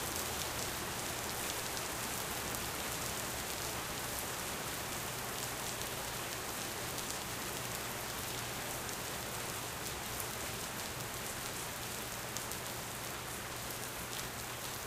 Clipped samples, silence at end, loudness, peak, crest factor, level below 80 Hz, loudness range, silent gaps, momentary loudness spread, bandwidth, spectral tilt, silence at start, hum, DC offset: under 0.1%; 0 s; -39 LUFS; -16 dBFS; 24 dB; -58 dBFS; 2 LU; none; 3 LU; 16 kHz; -2 dB/octave; 0 s; none; under 0.1%